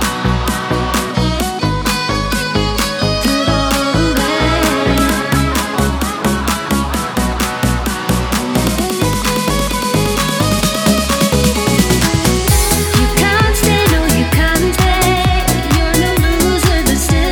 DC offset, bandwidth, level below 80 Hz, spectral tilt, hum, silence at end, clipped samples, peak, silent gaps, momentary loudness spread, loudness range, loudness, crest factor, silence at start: under 0.1%; over 20 kHz; -22 dBFS; -4.5 dB/octave; none; 0 s; under 0.1%; 0 dBFS; none; 4 LU; 4 LU; -14 LUFS; 14 dB; 0 s